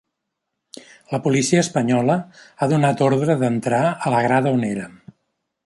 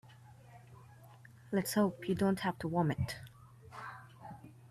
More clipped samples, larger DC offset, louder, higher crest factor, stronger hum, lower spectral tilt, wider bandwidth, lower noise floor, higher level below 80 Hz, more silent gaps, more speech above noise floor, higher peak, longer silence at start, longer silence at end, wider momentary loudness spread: neither; neither; first, -19 LUFS vs -35 LUFS; about the same, 18 dB vs 18 dB; neither; about the same, -6 dB/octave vs -6 dB/octave; second, 11.5 kHz vs 14.5 kHz; first, -79 dBFS vs -57 dBFS; about the same, -62 dBFS vs -64 dBFS; neither; first, 60 dB vs 24 dB; first, -4 dBFS vs -20 dBFS; first, 1.1 s vs 0.05 s; first, 0.75 s vs 0.05 s; second, 8 LU vs 25 LU